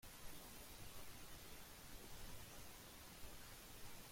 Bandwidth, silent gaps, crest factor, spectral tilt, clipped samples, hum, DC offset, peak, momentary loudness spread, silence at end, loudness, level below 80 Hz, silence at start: 16.5 kHz; none; 14 dB; -2.5 dB/octave; under 0.1%; none; under 0.1%; -40 dBFS; 1 LU; 0 s; -57 LUFS; -64 dBFS; 0 s